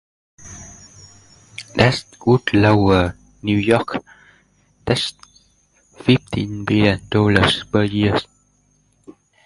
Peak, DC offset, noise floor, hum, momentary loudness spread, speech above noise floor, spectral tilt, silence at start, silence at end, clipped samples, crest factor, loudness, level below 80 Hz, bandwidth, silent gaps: 0 dBFS; under 0.1%; -60 dBFS; 50 Hz at -45 dBFS; 21 LU; 43 dB; -6 dB/octave; 0.4 s; 0.35 s; under 0.1%; 20 dB; -18 LUFS; -40 dBFS; 11.5 kHz; none